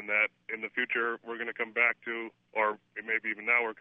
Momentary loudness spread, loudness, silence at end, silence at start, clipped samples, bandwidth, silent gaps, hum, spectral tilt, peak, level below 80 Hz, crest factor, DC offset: 10 LU; -30 LUFS; 0.05 s; 0 s; under 0.1%; 3.8 kHz; none; none; -6 dB/octave; -10 dBFS; under -90 dBFS; 22 dB; under 0.1%